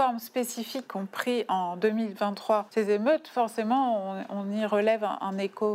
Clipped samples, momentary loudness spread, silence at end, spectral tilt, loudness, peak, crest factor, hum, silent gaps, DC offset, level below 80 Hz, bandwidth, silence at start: under 0.1%; 8 LU; 0 s; -5 dB/octave; -28 LUFS; -12 dBFS; 16 dB; none; none; under 0.1%; -90 dBFS; 16 kHz; 0 s